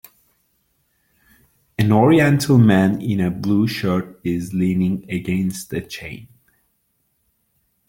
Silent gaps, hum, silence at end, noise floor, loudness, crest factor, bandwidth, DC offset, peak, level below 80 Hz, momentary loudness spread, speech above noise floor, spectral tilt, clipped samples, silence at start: none; none; 1.65 s; -68 dBFS; -18 LUFS; 18 dB; 17 kHz; under 0.1%; -2 dBFS; -52 dBFS; 16 LU; 50 dB; -7 dB/octave; under 0.1%; 1.8 s